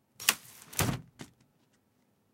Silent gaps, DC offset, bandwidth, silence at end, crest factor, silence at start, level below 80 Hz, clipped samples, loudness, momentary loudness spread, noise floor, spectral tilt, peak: none; under 0.1%; 16.5 kHz; 1.1 s; 34 dB; 0.2 s; -58 dBFS; under 0.1%; -32 LUFS; 23 LU; -72 dBFS; -2.5 dB/octave; -4 dBFS